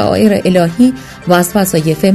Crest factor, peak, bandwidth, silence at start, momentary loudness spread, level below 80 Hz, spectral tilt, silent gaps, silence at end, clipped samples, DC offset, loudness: 10 dB; 0 dBFS; 14 kHz; 0 s; 3 LU; -40 dBFS; -5.5 dB/octave; none; 0 s; 0.2%; 0.2%; -11 LUFS